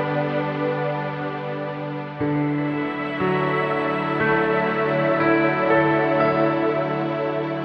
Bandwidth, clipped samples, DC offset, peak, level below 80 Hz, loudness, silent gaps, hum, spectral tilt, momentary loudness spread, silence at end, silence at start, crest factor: 6 kHz; under 0.1%; under 0.1%; -6 dBFS; -56 dBFS; -22 LUFS; none; none; -9 dB/octave; 9 LU; 0 s; 0 s; 16 dB